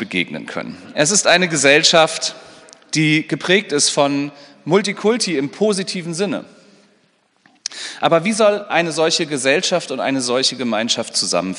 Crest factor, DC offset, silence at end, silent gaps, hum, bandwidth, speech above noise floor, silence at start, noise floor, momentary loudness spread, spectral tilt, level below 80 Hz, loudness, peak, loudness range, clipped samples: 18 dB; under 0.1%; 0 s; none; none; 11 kHz; 42 dB; 0 s; -60 dBFS; 14 LU; -3 dB/octave; -68 dBFS; -16 LUFS; 0 dBFS; 6 LU; under 0.1%